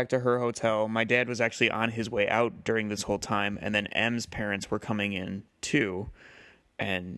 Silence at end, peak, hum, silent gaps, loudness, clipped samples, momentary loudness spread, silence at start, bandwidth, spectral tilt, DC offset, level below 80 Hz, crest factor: 0 s; -6 dBFS; none; none; -28 LUFS; under 0.1%; 8 LU; 0 s; 12.5 kHz; -4.5 dB/octave; under 0.1%; -56 dBFS; 22 dB